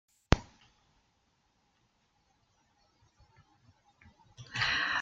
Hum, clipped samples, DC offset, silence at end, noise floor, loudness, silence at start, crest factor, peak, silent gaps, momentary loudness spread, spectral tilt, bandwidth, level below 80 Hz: none; under 0.1%; under 0.1%; 0 s; -74 dBFS; -31 LUFS; 0.3 s; 34 dB; -4 dBFS; none; 13 LU; -4.5 dB/octave; 8.8 kHz; -46 dBFS